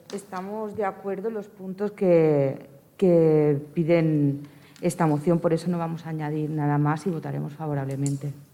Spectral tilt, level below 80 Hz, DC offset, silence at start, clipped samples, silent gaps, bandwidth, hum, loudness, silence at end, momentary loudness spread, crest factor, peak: -8 dB/octave; -66 dBFS; under 0.1%; 0.1 s; under 0.1%; none; 15 kHz; none; -25 LUFS; 0.1 s; 13 LU; 16 dB; -10 dBFS